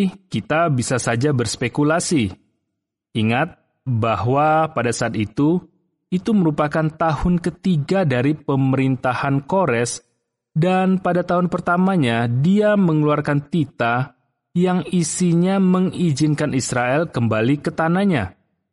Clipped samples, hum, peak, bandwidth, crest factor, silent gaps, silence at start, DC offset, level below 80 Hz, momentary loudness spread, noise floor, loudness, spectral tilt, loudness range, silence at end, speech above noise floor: under 0.1%; none; -6 dBFS; 11.5 kHz; 12 dB; none; 0 s; under 0.1%; -46 dBFS; 6 LU; -78 dBFS; -19 LUFS; -6 dB/octave; 3 LU; 0.4 s; 60 dB